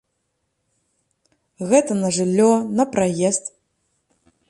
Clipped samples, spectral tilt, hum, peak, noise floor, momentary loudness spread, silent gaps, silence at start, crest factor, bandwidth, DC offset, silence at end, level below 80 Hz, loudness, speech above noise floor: under 0.1%; -5 dB/octave; none; -2 dBFS; -73 dBFS; 8 LU; none; 1.6 s; 18 dB; 11.5 kHz; under 0.1%; 1 s; -62 dBFS; -19 LUFS; 55 dB